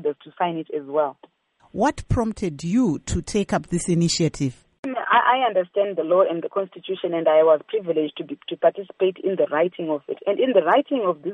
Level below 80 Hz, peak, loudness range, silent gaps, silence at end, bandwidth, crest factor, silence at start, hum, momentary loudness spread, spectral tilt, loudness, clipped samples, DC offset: -44 dBFS; -4 dBFS; 4 LU; 4.79-4.83 s; 0 s; 11.5 kHz; 16 dB; 0 s; none; 11 LU; -5.5 dB/octave; -22 LUFS; under 0.1%; under 0.1%